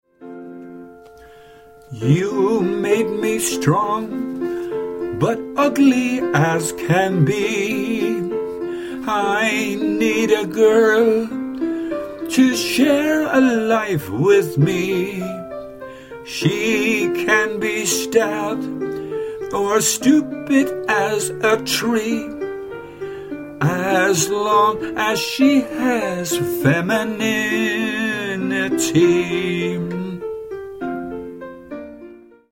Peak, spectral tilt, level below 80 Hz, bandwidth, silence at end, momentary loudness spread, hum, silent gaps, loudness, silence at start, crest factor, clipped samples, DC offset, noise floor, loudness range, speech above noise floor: -4 dBFS; -4.5 dB/octave; -54 dBFS; 16.5 kHz; 0.35 s; 15 LU; none; none; -18 LUFS; 0.2 s; 16 dB; under 0.1%; under 0.1%; -44 dBFS; 3 LU; 27 dB